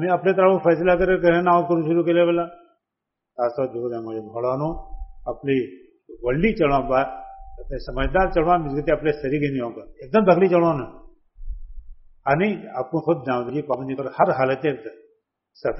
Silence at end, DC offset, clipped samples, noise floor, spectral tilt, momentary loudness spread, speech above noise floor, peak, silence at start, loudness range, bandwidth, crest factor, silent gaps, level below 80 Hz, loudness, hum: 0 s; under 0.1%; under 0.1%; -83 dBFS; -6 dB/octave; 17 LU; 62 dB; -4 dBFS; 0 s; 6 LU; 5.8 kHz; 18 dB; none; -40 dBFS; -21 LUFS; none